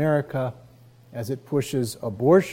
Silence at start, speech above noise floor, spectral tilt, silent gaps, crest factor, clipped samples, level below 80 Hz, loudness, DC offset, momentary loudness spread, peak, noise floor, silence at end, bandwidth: 0 s; 28 dB; -6.5 dB/octave; none; 18 dB; under 0.1%; -62 dBFS; -25 LUFS; under 0.1%; 14 LU; -6 dBFS; -51 dBFS; 0 s; 16.5 kHz